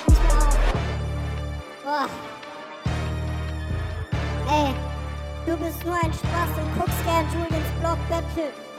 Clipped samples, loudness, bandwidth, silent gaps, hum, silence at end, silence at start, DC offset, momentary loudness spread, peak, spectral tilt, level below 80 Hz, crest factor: under 0.1%; -26 LUFS; 16 kHz; none; none; 0 s; 0 s; under 0.1%; 9 LU; -6 dBFS; -6 dB/octave; -26 dBFS; 18 dB